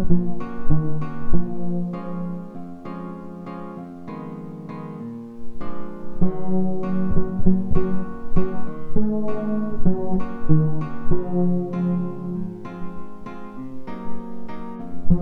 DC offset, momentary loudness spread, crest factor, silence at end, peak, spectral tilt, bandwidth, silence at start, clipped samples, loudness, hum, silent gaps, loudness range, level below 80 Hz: under 0.1%; 14 LU; 16 dB; 0 s; -2 dBFS; -11 dB/octave; 2.8 kHz; 0 s; under 0.1%; -27 LUFS; none; none; 10 LU; -30 dBFS